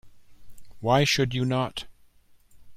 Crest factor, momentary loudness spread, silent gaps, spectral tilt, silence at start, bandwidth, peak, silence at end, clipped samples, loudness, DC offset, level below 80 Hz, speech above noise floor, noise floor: 18 dB; 16 LU; none; -5 dB/octave; 0.05 s; 15.5 kHz; -10 dBFS; 0 s; under 0.1%; -25 LUFS; under 0.1%; -52 dBFS; 33 dB; -56 dBFS